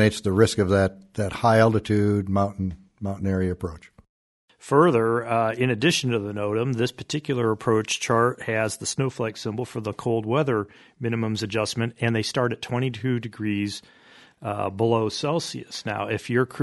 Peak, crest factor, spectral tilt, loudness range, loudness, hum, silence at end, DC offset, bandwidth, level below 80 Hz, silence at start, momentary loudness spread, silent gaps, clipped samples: -4 dBFS; 20 dB; -5.5 dB/octave; 4 LU; -24 LUFS; none; 0 s; under 0.1%; 11.5 kHz; -54 dBFS; 0 s; 11 LU; 4.09-4.48 s; under 0.1%